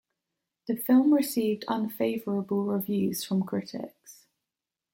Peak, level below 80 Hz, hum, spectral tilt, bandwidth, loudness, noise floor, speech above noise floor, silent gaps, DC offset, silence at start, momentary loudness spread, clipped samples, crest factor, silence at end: -12 dBFS; -74 dBFS; none; -6 dB/octave; 17 kHz; -27 LUFS; -89 dBFS; 62 dB; none; under 0.1%; 0.65 s; 14 LU; under 0.1%; 16 dB; 0.8 s